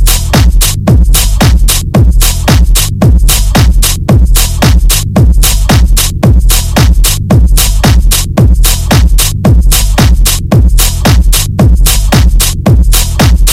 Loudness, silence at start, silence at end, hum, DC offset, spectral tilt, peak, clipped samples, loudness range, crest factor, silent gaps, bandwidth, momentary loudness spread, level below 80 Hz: -7 LUFS; 0 s; 0 s; none; under 0.1%; -4 dB/octave; 0 dBFS; 0.7%; 0 LU; 4 dB; none; 17 kHz; 2 LU; -6 dBFS